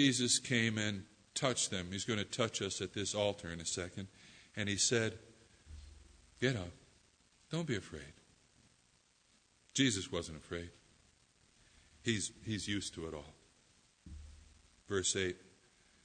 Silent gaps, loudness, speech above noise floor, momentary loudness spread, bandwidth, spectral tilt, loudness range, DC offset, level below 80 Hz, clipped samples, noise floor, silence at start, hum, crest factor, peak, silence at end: none; -37 LUFS; 35 dB; 23 LU; 9.6 kHz; -3 dB/octave; 6 LU; under 0.1%; -64 dBFS; under 0.1%; -72 dBFS; 0 s; none; 24 dB; -16 dBFS; 0.6 s